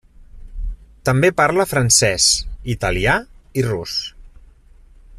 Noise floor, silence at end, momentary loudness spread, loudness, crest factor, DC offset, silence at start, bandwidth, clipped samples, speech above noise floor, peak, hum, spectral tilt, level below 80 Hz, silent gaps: -46 dBFS; 0 s; 20 LU; -17 LUFS; 18 dB; under 0.1%; 0.2 s; 15 kHz; under 0.1%; 30 dB; -2 dBFS; none; -3 dB/octave; -34 dBFS; none